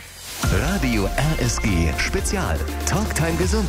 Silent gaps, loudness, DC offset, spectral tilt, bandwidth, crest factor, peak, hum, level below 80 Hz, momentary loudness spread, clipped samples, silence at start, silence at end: none; -22 LUFS; under 0.1%; -4.5 dB/octave; 16 kHz; 14 dB; -6 dBFS; none; -26 dBFS; 3 LU; under 0.1%; 0 s; 0 s